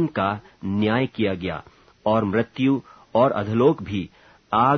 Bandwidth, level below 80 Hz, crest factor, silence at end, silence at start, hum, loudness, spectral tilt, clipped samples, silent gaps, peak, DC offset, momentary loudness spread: 6.4 kHz; -54 dBFS; 18 dB; 0 s; 0 s; none; -23 LUFS; -8.5 dB/octave; under 0.1%; none; -4 dBFS; under 0.1%; 11 LU